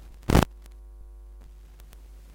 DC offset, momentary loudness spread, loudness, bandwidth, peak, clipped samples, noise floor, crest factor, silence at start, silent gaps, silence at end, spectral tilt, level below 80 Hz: under 0.1%; 27 LU; -25 LUFS; 17 kHz; -4 dBFS; under 0.1%; -47 dBFS; 26 dB; 0.3 s; none; 1.9 s; -6 dB/octave; -36 dBFS